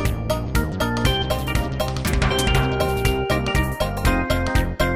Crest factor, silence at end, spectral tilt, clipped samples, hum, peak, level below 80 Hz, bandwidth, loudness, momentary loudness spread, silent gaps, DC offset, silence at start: 16 dB; 0 s; -5 dB/octave; under 0.1%; none; -6 dBFS; -26 dBFS; 16.5 kHz; -21 LUFS; 4 LU; none; 0.5%; 0 s